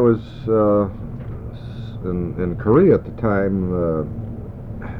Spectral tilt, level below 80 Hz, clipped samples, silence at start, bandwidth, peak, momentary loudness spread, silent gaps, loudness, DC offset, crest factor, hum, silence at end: -11 dB/octave; -38 dBFS; under 0.1%; 0 s; 5.4 kHz; -4 dBFS; 17 LU; none; -19 LUFS; under 0.1%; 16 dB; none; 0 s